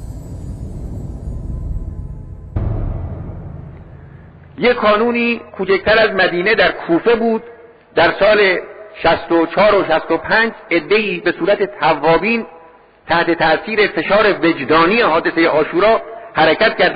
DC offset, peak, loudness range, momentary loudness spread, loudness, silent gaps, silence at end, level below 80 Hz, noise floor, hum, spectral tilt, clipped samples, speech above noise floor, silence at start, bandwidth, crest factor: under 0.1%; -4 dBFS; 13 LU; 17 LU; -14 LUFS; none; 0 s; -34 dBFS; -44 dBFS; none; -7.5 dB/octave; under 0.1%; 30 dB; 0 s; 8.2 kHz; 12 dB